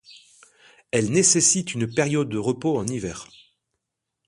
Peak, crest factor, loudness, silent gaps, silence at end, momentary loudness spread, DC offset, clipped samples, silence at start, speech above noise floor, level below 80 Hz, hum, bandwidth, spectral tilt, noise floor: -4 dBFS; 20 dB; -21 LUFS; none; 1.05 s; 14 LU; under 0.1%; under 0.1%; 0.1 s; 59 dB; -56 dBFS; none; 11.5 kHz; -3.5 dB/octave; -81 dBFS